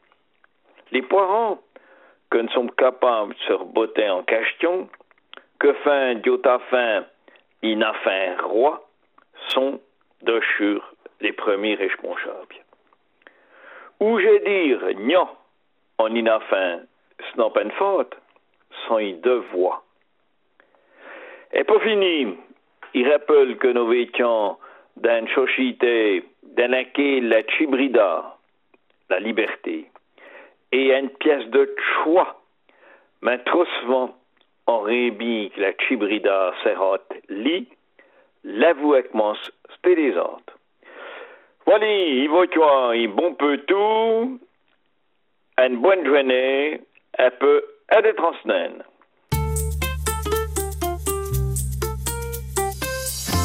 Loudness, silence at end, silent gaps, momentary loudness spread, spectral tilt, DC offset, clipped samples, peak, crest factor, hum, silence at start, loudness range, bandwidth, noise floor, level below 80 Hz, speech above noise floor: -21 LUFS; 0 s; none; 11 LU; -4.5 dB/octave; under 0.1%; under 0.1%; -2 dBFS; 20 dB; none; 0.9 s; 5 LU; 15.5 kHz; -71 dBFS; -42 dBFS; 51 dB